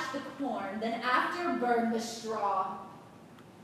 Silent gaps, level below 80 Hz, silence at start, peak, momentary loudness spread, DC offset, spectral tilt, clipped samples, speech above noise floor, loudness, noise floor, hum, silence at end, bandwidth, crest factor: none; -74 dBFS; 0 s; -16 dBFS; 10 LU; under 0.1%; -4 dB/octave; under 0.1%; 21 dB; -32 LUFS; -53 dBFS; none; 0 s; 15 kHz; 18 dB